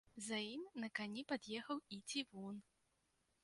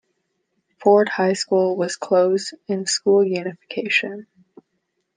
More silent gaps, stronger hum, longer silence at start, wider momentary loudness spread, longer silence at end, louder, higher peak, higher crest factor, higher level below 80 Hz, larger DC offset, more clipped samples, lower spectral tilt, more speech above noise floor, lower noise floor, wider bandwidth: neither; neither; second, 0.15 s vs 0.8 s; second, 7 LU vs 11 LU; second, 0.8 s vs 0.95 s; second, -47 LUFS vs -20 LUFS; second, -28 dBFS vs -2 dBFS; about the same, 20 dB vs 18 dB; second, -86 dBFS vs -76 dBFS; neither; neither; about the same, -3 dB/octave vs -4 dB/octave; second, 36 dB vs 54 dB; first, -83 dBFS vs -73 dBFS; first, 11.5 kHz vs 10 kHz